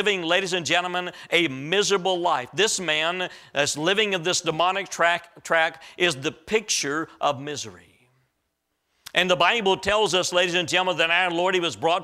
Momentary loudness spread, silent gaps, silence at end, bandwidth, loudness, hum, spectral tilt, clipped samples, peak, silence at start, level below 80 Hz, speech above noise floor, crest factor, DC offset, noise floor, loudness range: 7 LU; none; 0 s; 15.5 kHz; -22 LUFS; none; -2.5 dB/octave; under 0.1%; -4 dBFS; 0 s; -60 dBFS; 53 dB; 20 dB; under 0.1%; -76 dBFS; 4 LU